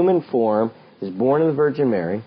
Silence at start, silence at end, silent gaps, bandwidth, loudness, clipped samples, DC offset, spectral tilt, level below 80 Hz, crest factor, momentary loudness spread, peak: 0 s; 0.05 s; none; 5.4 kHz; -20 LUFS; under 0.1%; under 0.1%; -11.5 dB/octave; -64 dBFS; 12 dB; 10 LU; -8 dBFS